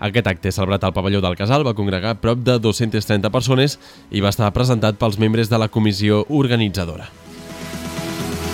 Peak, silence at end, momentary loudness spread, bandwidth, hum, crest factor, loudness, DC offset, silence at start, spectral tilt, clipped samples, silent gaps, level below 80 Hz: 0 dBFS; 0 s; 11 LU; 16.5 kHz; none; 18 dB; -18 LUFS; under 0.1%; 0 s; -6 dB/octave; under 0.1%; none; -42 dBFS